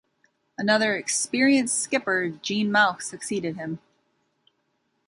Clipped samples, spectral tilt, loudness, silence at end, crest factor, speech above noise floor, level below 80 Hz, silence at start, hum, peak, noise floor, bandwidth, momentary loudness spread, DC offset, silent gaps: under 0.1%; -3 dB/octave; -23 LUFS; 1.3 s; 20 dB; 49 dB; -70 dBFS; 0.6 s; none; -6 dBFS; -73 dBFS; 11.5 kHz; 13 LU; under 0.1%; none